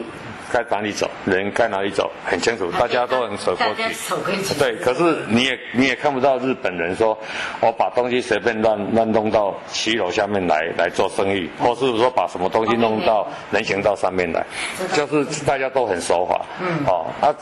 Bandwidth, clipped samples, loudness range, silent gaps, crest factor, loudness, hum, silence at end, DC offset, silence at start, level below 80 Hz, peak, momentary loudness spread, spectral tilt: 12.5 kHz; under 0.1%; 1 LU; none; 16 dB; -20 LUFS; none; 0 s; under 0.1%; 0 s; -52 dBFS; -4 dBFS; 5 LU; -4.5 dB/octave